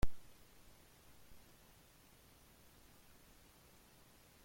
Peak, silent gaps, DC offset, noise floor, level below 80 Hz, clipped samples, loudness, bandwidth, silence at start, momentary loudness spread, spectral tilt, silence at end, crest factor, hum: -22 dBFS; none; under 0.1%; -65 dBFS; -54 dBFS; under 0.1%; -62 LUFS; 16.5 kHz; 0 s; 0 LU; -5 dB/octave; 0.3 s; 22 dB; none